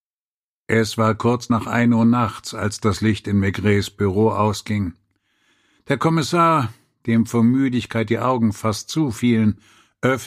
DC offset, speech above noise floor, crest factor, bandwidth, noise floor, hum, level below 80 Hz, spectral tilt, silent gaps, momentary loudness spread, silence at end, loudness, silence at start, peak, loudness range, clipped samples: under 0.1%; over 71 dB; 16 dB; 15 kHz; under -90 dBFS; none; -52 dBFS; -6 dB/octave; none; 8 LU; 0 s; -20 LUFS; 0.7 s; -2 dBFS; 2 LU; under 0.1%